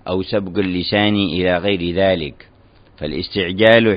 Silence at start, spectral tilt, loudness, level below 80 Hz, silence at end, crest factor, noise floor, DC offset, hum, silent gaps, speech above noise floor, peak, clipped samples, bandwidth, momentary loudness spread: 0.05 s; -8.5 dB/octave; -17 LUFS; -44 dBFS; 0 s; 18 dB; -48 dBFS; under 0.1%; none; none; 31 dB; 0 dBFS; under 0.1%; 5.2 kHz; 11 LU